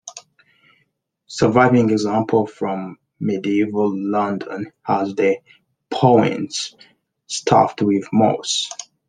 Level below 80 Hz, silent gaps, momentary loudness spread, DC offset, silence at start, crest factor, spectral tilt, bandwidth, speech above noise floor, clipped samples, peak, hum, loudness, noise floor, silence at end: -58 dBFS; none; 14 LU; under 0.1%; 0.05 s; 18 dB; -5.5 dB/octave; 10 kHz; 50 dB; under 0.1%; 0 dBFS; none; -19 LUFS; -68 dBFS; 0.25 s